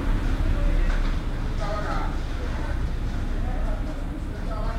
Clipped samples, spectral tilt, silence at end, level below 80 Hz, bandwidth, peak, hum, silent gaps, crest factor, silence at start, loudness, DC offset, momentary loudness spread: under 0.1%; -6.5 dB/octave; 0 s; -26 dBFS; 9 kHz; -12 dBFS; none; none; 12 dB; 0 s; -29 LUFS; under 0.1%; 6 LU